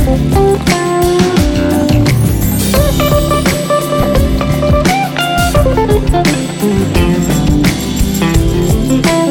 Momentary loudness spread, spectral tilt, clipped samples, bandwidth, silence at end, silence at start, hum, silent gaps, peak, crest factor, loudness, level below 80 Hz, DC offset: 3 LU; -5.5 dB/octave; under 0.1%; 19 kHz; 0 s; 0 s; none; none; 0 dBFS; 10 dB; -11 LUFS; -18 dBFS; under 0.1%